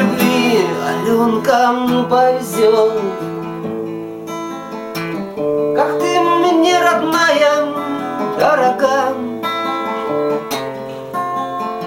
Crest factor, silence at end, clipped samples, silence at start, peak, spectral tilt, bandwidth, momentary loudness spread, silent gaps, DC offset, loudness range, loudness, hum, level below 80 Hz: 14 dB; 0 s; under 0.1%; 0 s; -2 dBFS; -4.5 dB/octave; 17 kHz; 12 LU; none; under 0.1%; 5 LU; -16 LUFS; none; -58 dBFS